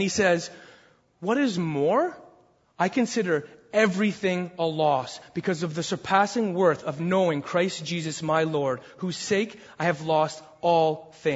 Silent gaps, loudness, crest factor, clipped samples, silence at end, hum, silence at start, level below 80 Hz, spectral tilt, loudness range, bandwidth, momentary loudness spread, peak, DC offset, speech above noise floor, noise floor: none; -26 LUFS; 20 dB; under 0.1%; 0 s; none; 0 s; -66 dBFS; -5 dB/octave; 2 LU; 8 kHz; 7 LU; -6 dBFS; under 0.1%; 33 dB; -58 dBFS